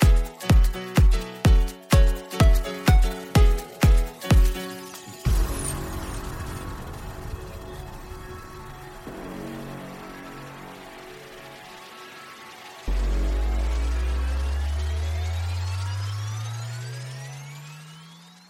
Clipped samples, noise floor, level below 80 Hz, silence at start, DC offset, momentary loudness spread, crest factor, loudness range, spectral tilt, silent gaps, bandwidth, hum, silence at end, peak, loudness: under 0.1%; -47 dBFS; -24 dBFS; 0 s; under 0.1%; 20 LU; 18 dB; 17 LU; -5.5 dB/octave; none; 16 kHz; none; 0.35 s; -6 dBFS; -25 LUFS